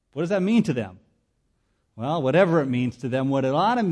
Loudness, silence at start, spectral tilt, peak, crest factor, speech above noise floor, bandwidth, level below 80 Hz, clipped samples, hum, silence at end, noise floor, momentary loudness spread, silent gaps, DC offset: -23 LUFS; 0.15 s; -7.5 dB/octave; -8 dBFS; 16 dB; 48 dB; 11 kHz; -62 dBFS; under 0.1%; none; 0 s; -70 dBFS; 9 LU; none; under 0.1%